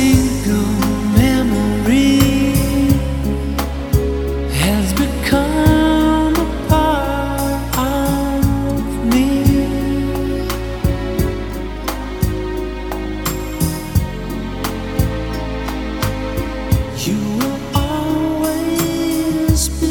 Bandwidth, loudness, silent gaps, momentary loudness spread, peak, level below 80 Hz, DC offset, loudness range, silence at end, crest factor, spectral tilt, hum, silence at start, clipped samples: 19.5 kHz; -17 LUFS; none; 9 LU; 0 dBFS; -24 dBFS; under 0.1%; 6 LU; 0 s; 16 dB; -5.5 dB/octave; none; 0 s; under 0.1%